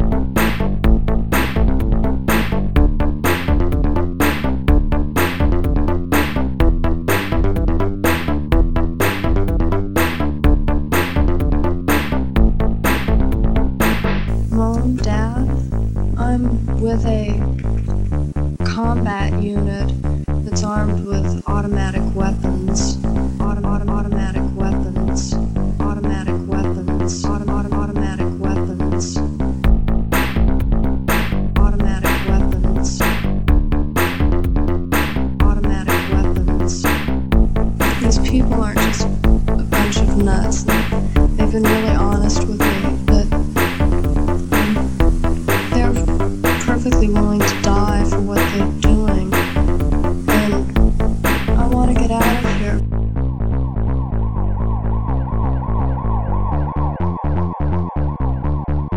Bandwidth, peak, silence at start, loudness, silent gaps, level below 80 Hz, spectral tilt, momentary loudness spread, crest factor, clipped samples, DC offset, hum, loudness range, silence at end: 17 kHz; 0 dBFS; 0 s; -18 LUFS; none; -20 dBFS; -6 dB/octave; 5 LU; 14 dB; under 0.1%; 5%; none; 4 LU; 0 s